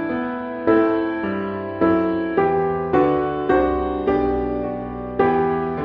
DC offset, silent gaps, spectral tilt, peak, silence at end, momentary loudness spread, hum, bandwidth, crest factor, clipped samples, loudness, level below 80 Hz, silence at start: under 0.1%; none; -6 dB/octave; -4 dBFS; 0 s; 8 LU; none; 5.2 kHz; 16 dB; under 0.1%; -20 LUFS; -40 dBFS; 0 s